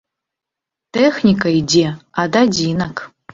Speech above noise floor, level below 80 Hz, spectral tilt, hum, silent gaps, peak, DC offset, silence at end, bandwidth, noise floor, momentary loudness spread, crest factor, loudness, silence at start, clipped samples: 69 dB; -48 dBFS; -5 dB/octave; none; none; 0 dBFS; under 0.1%; 0.25 s; 7.8 kHz; -84 dBFS; 10 LU; 16 dB; -16 LUFS; 0.95 s; under 0.1%